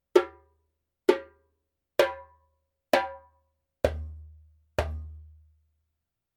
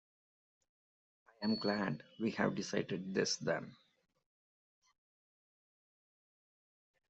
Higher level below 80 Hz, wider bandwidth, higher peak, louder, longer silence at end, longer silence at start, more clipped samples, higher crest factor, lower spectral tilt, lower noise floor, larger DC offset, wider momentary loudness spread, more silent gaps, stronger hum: first, -46 dBFS vs -80 dBFS; first, 18 kHz vs 8 kHz; first, -4 dBFS vs -18 dBFS; first, -29 LUFS vs -38 LUFS; second, 1.1 s vs 3.35 s; second, 0.15 s vs 1.4 s; neither; about the same, 26 dB vs 24 dB; first, -5.5 dB/octave vs -4 dB/octave; second, -83 dBFS vs under -90 dBFS; neither; first, 19 LU vs 6 LU; neither; neither